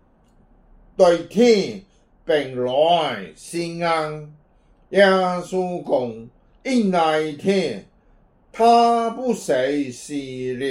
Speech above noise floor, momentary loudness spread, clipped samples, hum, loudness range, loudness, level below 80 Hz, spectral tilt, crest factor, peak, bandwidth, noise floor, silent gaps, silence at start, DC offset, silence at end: 36 dB; 15 LU; under 0.1%; none; 3 LU; -20 LUFS; -56 dBFS; -5 dB/octave; 18 dB; -2 dBFS; 15.5 kHz; -56 dBFS; none; 1 s; under 0.1%; 0 s